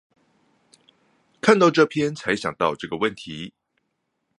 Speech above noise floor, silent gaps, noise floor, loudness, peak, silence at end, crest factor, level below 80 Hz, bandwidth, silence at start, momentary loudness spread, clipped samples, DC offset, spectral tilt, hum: 55 dB; none; -75 dBFS; -21 LUFS; 0 dBFS; 0.9 s; 24 dB; -62 dBFS; 11 kHz; 1.45 s; 19 LU; under 0.1%; under 0.1%; -5 dB/octave; none